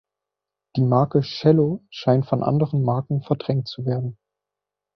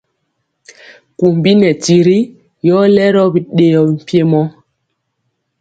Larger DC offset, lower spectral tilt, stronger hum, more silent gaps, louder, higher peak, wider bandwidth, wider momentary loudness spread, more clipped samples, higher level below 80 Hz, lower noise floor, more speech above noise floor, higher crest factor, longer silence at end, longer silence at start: neither; first, -9.5 dB/octave vs -6.5 dB/octave; first, 50 Hz at -40 dBFS vs none; neither; second, -22 LUFS vs -11 LUFS; second, -4 dBFS vs 0 dBFS; second, 6.2 kHz vs 9 kHz; about the same, 8 LU vs 6 LU; neither; about the same, -58 dBFS vs -54 dBFS; first, -86 dBFS vs -69 dBFS; first, 66 dB vs 59 dB; first, 18 dB vs 12 dB; second, 0.85 s vs 1.1 s; second, 0.75 s vs 1.2 s